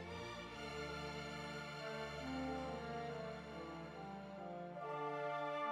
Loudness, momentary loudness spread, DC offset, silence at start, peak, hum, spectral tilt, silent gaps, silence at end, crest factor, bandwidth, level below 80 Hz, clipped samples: -47 LUFS; 7 LU; under 0.1%; 0 s; -30 dBFS; none; -5.5 dB/octave; none; 0 s; 16 dB; 16 kHz; -64 dBFS; under 0.1%